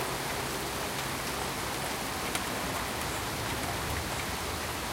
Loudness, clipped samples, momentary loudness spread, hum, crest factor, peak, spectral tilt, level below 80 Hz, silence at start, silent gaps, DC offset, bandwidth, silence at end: -33 LUFS; under 0.1%; 1 LU; none; 18 dB; -16 dBFS; -3 dB/octave; -48 dBFS; 0 s; none; under 0.1%; 17 kHz; 0 s